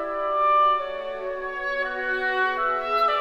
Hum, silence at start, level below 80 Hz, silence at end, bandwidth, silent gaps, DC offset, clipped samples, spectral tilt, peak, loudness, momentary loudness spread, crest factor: none; 0 s; -52 dBFS; 0 s; 13.5 kHz; none; under 0.1%; under 0.1%; -3.5 dB/octave; -12 dBFS; -24 LUFS; 11 LU; 12 dB